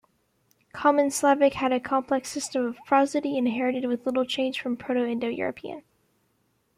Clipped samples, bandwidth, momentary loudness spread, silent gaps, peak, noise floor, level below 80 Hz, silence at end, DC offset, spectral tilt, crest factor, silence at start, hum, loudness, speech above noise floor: under 0.1%; 15.5 kHz; 9 LU; none; -8 dBFS; -70 dBFS; -66 dBFS; 0.95 s; under 0.1%; -3.5 dB/octave; 18 dB; 0.75 s; none; -25 LUFS; 45 dB